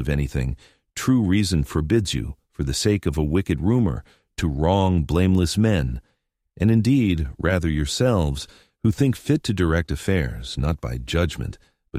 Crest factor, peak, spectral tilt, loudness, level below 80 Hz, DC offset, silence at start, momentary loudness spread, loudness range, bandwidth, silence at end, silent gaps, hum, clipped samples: 16 dB; -4 dBFS; -6 dB/octave; -22 LUFS; -34 dBFS; under 0.1%; 0 s; 11 LU; 2 LU; 15.5 kHz; 0 s; none; none; under 0.1%